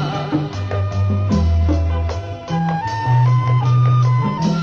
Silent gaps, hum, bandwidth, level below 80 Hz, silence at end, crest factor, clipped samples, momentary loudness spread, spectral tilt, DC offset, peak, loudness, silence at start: none; none; 6.8 kHz; -28 dBFS; 0 s; 10 dB; under 0.1%; 8 LU; -8 dB/octave; under 0.1%; -6 dBFS; -18 LUFS; 0 s